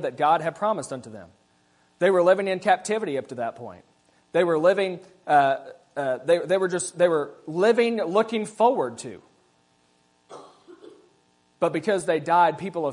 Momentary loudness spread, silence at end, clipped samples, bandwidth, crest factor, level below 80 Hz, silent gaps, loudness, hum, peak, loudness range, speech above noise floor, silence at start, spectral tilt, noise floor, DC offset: 12 LU; 0 s; under 0.1%; 11 kHz; 18 dB; -74 dBFS; none; -23 LUFS; none; -6 dBFS; 7 LU; 41 dB; 0 s; -5 dB/octave; -64 dBFS; under 0.1%